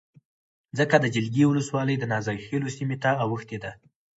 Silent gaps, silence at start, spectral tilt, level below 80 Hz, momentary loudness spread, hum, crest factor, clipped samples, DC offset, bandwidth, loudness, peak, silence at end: none; 0.75 s; -6.5 dB/octave; -62 dBFS; 13 LU; none; 20 dB; under 0.1%; under 0.1%; 8 kHz; -25 LUFS; -4 dBFS; 0.4 s